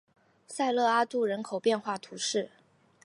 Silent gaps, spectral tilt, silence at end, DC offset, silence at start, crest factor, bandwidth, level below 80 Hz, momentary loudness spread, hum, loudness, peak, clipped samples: none; -3 dB/octave; 0.55 s; under 0.1%; 0.5 s; 18 dB; 11.5 kHz; -84 dBFS; 10 LU; none; -29 LUFS; -14 dBFS; under 0.1%